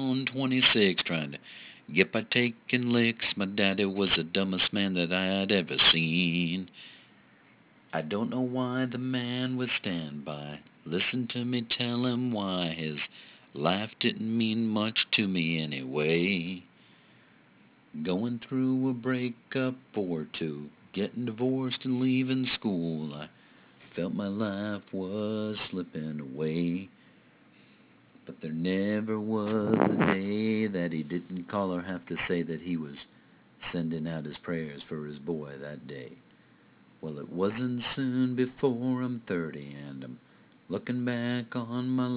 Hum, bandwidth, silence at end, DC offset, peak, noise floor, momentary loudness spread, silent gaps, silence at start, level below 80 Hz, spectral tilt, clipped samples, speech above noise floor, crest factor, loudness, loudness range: none; 4 kHz; 0 s; under 0.1%; -6 dBFS; -60 dBFS; 15 LU; none; 0 s; -64 dBFS; -4 dB/octave; under 0.1%; 30 dB; 24 dB; -30 LUFS; 8 LU